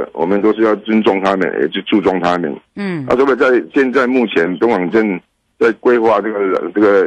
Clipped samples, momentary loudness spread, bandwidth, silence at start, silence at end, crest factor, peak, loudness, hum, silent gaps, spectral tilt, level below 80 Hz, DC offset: under 0.1%; 6 LU; 8.6 kHz; 0 s; 0 s; 10 dB; -4 dBFS; -14 LUFS; none; none; -7 dB/octave; -52 dBFS; under 0.1%